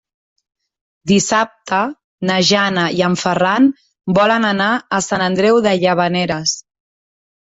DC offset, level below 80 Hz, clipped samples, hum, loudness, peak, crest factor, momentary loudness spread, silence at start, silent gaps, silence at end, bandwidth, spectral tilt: under 0.1%; -54 dBFS; under 0.1%; none; -15 LUFS; 0 dBFS; 16 dB; 6 LU; 1.05 s; 2.04-2.18 s; 0.9 s; 8 kHz; -4 dB/octave